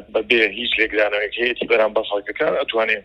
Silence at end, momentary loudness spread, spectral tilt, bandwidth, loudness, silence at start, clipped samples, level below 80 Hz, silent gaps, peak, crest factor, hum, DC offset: 0.05 s; 5 LU; -4.5 dB/octave; 9.6 kHz; -19 LUFS; 0 s; under 0.1%; -52 dBFS; none; 0 dBFS; 20 dB; none; under 0.1%